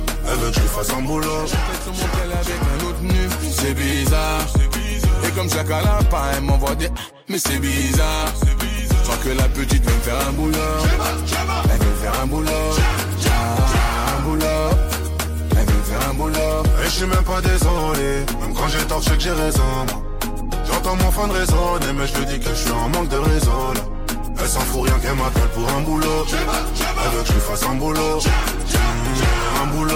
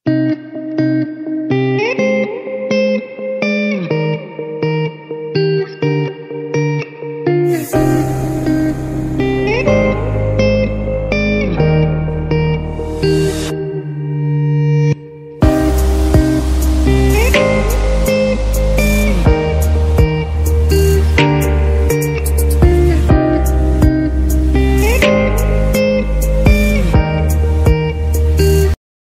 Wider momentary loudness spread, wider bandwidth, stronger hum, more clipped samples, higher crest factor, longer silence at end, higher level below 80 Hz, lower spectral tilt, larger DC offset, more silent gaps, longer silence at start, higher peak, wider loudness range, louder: second, 4 LU vs 8 LU; about the same, 17 kHz vs 16 kHz; neither; neither; about the same, 12 dB vs 12 dB; second, 0 s vs 0.35 s; about the same, -20 dBFS vs -18 dBFS; second, -4.5 dB/octave vs -6.5 dB/octave; neither; neither; about the same, 0 s vs 0.05 s; second, -6 dBFS vs 0 dBFS; second, 1 LU vs 4 LU; second, -20 LUFS vs -14 LUFS